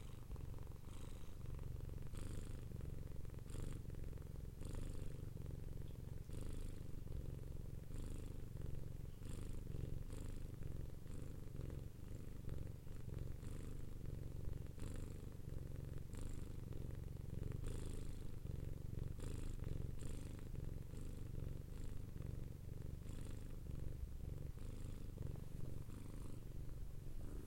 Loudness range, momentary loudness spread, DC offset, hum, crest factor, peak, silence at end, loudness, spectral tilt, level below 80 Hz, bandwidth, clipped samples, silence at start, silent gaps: 2 LU; 4 LU; under 0.1%; none; 14 dB; -32 dBFS; 0 s; -52 LUFS; -7 dB/octave; -50 dBFS; 16.5 kHz; under 0.1%; 0 s; none